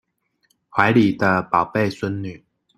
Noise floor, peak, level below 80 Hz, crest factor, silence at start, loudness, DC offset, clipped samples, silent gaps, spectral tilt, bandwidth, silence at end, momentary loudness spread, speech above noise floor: -67 dBFS; 0 dBFS; -56 dBFS; 20 dB; 0.75 s; -19 LUFS; under 0.1%; under 0.1%; none; -7 dB/octave; 13 kHz; 0.4 s; 12 LU; 48 dB